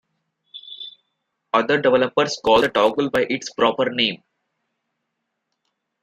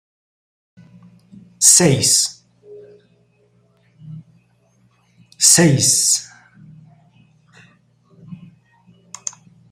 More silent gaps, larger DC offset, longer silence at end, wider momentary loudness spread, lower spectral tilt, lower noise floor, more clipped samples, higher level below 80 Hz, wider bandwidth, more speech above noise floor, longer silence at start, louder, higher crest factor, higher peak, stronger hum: neither; neither; first, 1.85 s vs 0.4 s; about the same, 19 LU vs 20 LU; first, -4 dB/octave vs -2.5 dB/octave; first, -77 dBFS vs -58 dBFS; neither; about the same, -58 dBFS vs -58 dBFS; about the same, 15 kHz vs 16 kHz; first, 59 dB vs 45 dB; second, 0.55 s vs 1.6 s; second, -19 LUFS vs -12 LUFS; about the same, 20 dB vs 22 dB; about the same, -2 dBFS vs 0 dBFS; neither